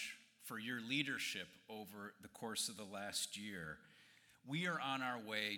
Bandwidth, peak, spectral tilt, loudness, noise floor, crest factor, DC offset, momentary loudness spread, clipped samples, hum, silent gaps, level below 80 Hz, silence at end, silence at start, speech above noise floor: 19 kHz; -24 dBFS; -2.5 dB/octave; -44 LUFS; -68 dBFS; 20 dB; under 0.1%; 14 LU; under 0.1%; none; none; -84 dBFS; 0 s; 0 s; 23 dB